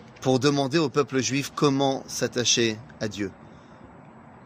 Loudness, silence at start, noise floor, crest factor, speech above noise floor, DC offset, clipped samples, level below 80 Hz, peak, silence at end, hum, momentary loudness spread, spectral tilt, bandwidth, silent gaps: -24 LUFS; 0 s; -48 dBFS; 22 dB; 23 dB; under 0.1%; under 0.1%; -62 dBFS; -4 dBFS; 0.05 s; none; 11 LU; -4 dB/octave; 15.5 kHz; none